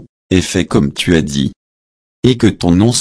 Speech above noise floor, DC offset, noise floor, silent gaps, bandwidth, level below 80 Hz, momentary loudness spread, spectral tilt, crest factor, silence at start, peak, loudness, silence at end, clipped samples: over 78 dB; under 0.1%; under -90 dBFS; 0.09-0.30 s, 1.56-2.23 s; 11 kHz; -34 dBFS; 6 LU; -5.5 dB/octave; 14 dB; 0 s; 0 dBFS; -14 LUFS; 0 s; under 0.1%